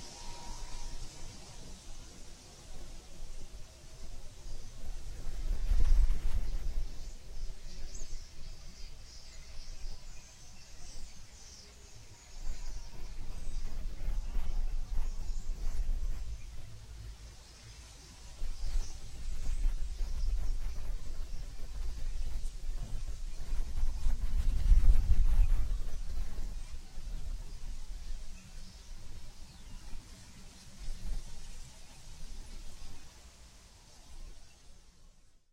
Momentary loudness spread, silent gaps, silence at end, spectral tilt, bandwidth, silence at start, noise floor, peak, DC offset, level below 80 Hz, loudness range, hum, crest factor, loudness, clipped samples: 17 LU; none; 0.45 s; -4.5 dB/octave; 10 kHz; 0 s; -58 dBFS; -12 dBFS; under 0.1%; -34 dBFS; 16 LU; none; 20 dB; -42 LUFS; under 0.1%